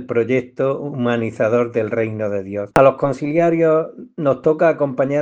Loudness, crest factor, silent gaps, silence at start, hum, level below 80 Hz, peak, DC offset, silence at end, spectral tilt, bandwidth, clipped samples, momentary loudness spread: -18 LUFS; 18 dB; none; 0 s; none; -56 dBFS; 0 dBFS; under 0.1%; 0 s; -8 dB/octave; 10 kHz; under 0.1%; 7 LU